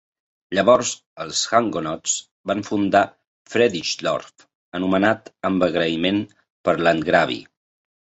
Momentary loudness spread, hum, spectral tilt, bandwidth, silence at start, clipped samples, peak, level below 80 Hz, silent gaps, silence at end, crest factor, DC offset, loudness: 9 LU; none; -3.5 dB/octave; 8.2 kHz; 0.5 s; under 0.1%; -2 dBFS; -56 dBFS; 1.06-1.16 s, 2.31-2.44 s, 3.27-3.45 s, 4.55-4.72 s, 6.50-6.64 s; 0.75 s; 20 dB; under 0.1%; -21 LUFS